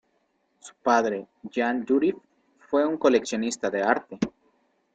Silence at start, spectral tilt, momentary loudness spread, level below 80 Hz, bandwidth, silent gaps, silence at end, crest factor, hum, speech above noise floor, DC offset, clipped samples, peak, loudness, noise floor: 0.65 s; -4.5 dB/octave; 10 LU; -66 dBFS; 9.2 kHz; none; 0.65 s; 22 dB; none; 46 dB; under 0.1%; under 0.1%; -6 dBFS; -25 LUFS; -71 dBFS